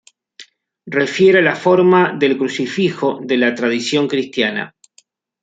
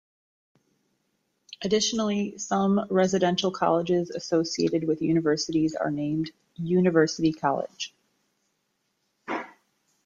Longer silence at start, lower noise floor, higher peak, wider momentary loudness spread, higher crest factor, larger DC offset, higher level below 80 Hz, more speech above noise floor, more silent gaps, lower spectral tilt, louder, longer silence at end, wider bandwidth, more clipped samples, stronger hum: second, 0.4 s vs 1.5 s; second, -55 dBFS vs -75 dBFS; first, -2 dBFS vs -8 dBFS; second, 8 LU vs 12 LU; about the same, 16 dB vs 18 dB; neither; about the same, -64 dBFS vs -64 dBFS; second, 40 dB vs 51 dB; neither; about the same, -5.5 dB/octave vs -5 dB/octave; first, -15 LUFS vs -26 LUFS; first, 0.75 s vs 0.55 s; about the same, 8 kHz vs 7.8 kHz; neither; neither